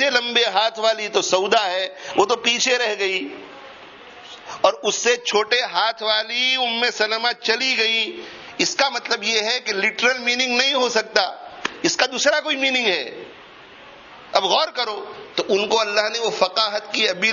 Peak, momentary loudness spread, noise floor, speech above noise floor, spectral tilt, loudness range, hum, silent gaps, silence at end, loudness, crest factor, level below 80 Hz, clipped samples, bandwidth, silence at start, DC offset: 0 dBFS; 11 LU; -43 dBFS; 23 dB; -1 dB/octave; 3 LU; none; none; 0 s; -19 LUFS; 20 dB; -68 dBFS; under 0.1%; 7.4 kHz; 0 s; under 0.1%